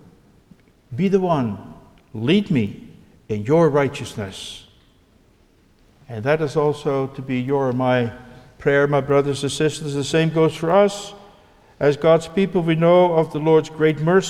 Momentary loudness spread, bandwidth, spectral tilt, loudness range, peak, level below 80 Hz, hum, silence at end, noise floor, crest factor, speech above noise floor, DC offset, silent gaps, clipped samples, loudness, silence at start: 14 LU; 13 kHz; -6.5 dB/octave; 6 LU; -4 dBFS; -52 dBFS; none; 0 s; -56 dBFS; 16 dB; 37 dB; under 0.1%; none; under 0.1%; -19 LUFS; 0.9 s